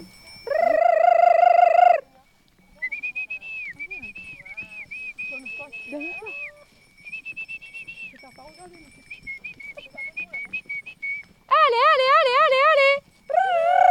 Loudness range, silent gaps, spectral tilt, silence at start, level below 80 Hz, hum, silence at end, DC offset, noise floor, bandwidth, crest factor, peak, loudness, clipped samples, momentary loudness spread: 17 LU; none; -2.5 dB/octave; 0 s; -64 dBFS; none; 0 s; under 0.1%; -58 dBFS; 10 kHz; 16 dB; -6 dBFS; -20 LUFS; under 0.1%; 20 LU